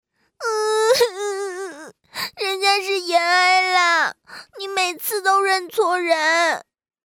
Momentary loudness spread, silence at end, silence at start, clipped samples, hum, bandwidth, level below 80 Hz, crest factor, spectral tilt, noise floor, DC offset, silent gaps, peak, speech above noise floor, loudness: 14 LU; 0.45 s; 0.4 s; under 0.1%; none; over 20 kHz; -70 dBFS; 16 dB; 0 dB/octave; -40 dBFS; under 0.1%; none; -4 dBFS; 20 dB; -19 LUFS